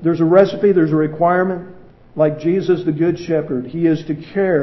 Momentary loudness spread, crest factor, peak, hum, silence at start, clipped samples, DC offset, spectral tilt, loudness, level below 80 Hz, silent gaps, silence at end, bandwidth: 9 LU; 16 dB; 0 dBFS; none; 0 s; under 0.1%; under 0.1%; -9 dB/octave; -16 LUFS; -52 dBFS; none; 0 s; 6 kHz